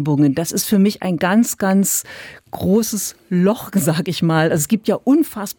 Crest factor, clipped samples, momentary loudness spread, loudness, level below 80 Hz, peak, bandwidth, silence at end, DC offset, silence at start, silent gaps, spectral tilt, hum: 12 dB; under 0.1%; 6 LU; -17 LUFS; -56 dBFS; -4 dBFS; 19.5 kHz; 0.05 s; under 0.1%; 0 s; none; -5 dB/octave; none